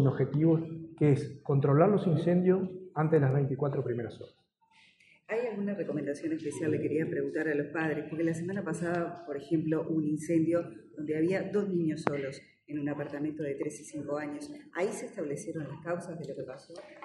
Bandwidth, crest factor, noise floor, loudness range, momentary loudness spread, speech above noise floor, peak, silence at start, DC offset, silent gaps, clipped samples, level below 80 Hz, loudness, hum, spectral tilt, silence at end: 11.5 kHz; 24 dB; -65 dBFS; 9 LU; 14 LU; 34 dB; -8 dBFS; 0 s; under 0.1%; none; under 0.1%; -72 dBFS; -31 LUFS; none; -8 dB/octave; 0.05 s